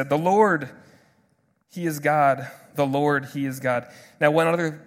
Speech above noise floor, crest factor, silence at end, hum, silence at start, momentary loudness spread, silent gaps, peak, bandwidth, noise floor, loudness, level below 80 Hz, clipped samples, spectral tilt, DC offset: 44 dB; 20 dB; 0.05 s; none; 0 s; 11 LU; none; -4 dBFS; 16.5 kHz; -66 dBFS; -22 LUFS; -70 dBFS; under 0.1%; -6 dB/octave; under 0.1%